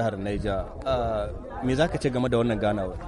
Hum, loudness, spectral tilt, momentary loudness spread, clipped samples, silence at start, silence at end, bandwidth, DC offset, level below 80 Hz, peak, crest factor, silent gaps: none; -27 LUFS; -7 dB/octave; 6 LU; under 0.1%; 0 s; 0 s; 11.5 kHz; under 0.1%; -38 dBFS; -10 dBFS; 16 dB; none